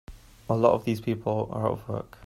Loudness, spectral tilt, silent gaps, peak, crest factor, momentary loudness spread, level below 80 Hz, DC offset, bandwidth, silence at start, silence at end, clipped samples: -27 LUFS; -8 dB/octave; none; -6 dBFS; 22 dB; 11 LU; -52 dBFS; under 0.1%; 14.5 kHz; 0.1 s; 0 s; under 0.1%